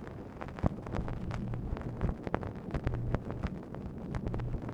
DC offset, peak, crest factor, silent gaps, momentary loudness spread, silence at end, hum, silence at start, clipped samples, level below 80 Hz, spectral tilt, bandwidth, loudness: under 0.1%; -10 dBFS; 28 dB; none; 7 LU; 0 s; none; 0 s; under 0.1%; -42 dBFS; -8.5 dB/octave; 8.8 kHz; -38 LUFS